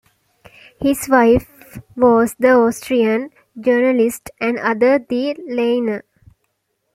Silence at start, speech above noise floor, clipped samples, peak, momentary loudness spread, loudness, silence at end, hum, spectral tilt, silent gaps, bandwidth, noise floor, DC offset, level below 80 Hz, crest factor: 0.8 s; 54 dB; under 0.1%; -2 dBFS; 10 LU; -16 LUFS; 0.95 s; none; -5 dB/octave; none; 16 kHz; -70 dBFS; under 0.1%; -46 dBFS; 16 dB